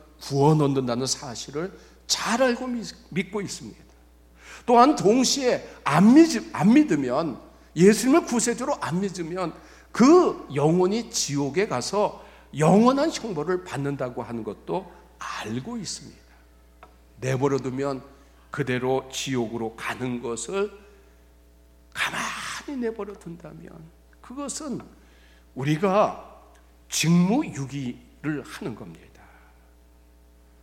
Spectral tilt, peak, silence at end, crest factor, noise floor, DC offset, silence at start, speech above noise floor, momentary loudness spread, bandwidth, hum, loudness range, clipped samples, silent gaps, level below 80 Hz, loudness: -5 dB/octave; -4 dBFS; 1.65 s; 22 dB; -54 dBFS; under 0.1%; 0.2 s; 31 dB; 18 LU; 16.5 kHz; none; 13 LU; under 0.1%; none; -54 dBFS; -24 LUFS